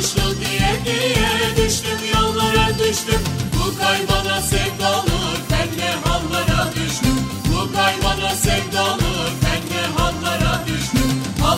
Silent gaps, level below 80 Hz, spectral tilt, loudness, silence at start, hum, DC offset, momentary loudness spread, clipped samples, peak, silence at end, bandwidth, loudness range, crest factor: none; -28 dBFS; -4 dB/octave; -18 LUFS; 0 s; none; under 0.1%; 4 LU; under 0.1%; -2 dBFS; 0 s; 16.5 kHz; 2 LU; 16 dB